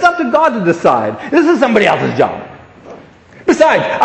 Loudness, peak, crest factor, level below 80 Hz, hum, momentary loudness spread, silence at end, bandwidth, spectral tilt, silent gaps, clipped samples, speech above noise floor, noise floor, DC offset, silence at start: -12 LUFS; 0 dBFS; 12 dB; -50 dBFS; none; 6 LU; 0 s; 8.8 kHz; -5.5 dB/octave; none; under 0.1%; 28 dB; -39 dBFS; under 0.1%; 0 s